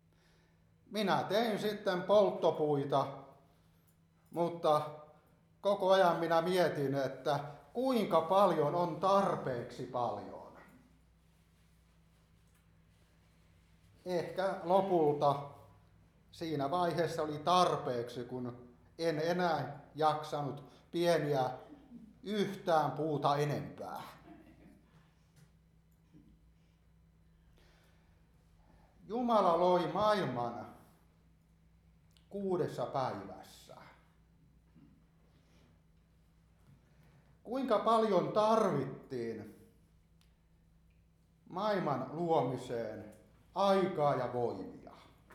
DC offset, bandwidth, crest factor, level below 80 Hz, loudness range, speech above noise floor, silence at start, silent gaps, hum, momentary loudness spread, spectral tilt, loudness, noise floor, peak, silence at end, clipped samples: under 0.1%; 15 kHz; 20 dB; -70 dBFS; 9 LU; 35 dB; 0.9 s; none; none; 18 LU; -6 dB/octave; -33 LUFS; -68 dBFS; -14 dBFS; 0 s; under 0.1%